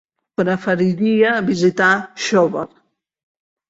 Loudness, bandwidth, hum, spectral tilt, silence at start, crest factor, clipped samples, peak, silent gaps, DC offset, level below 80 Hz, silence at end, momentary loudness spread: -17 LUFS; 8 kHz; none; -5.5 dB/octave; 0.4 s; 16 dB; under 0.1%; -2 dBFS; none; under 0.1%; -60 dBFS; 1.05 s; 9 LU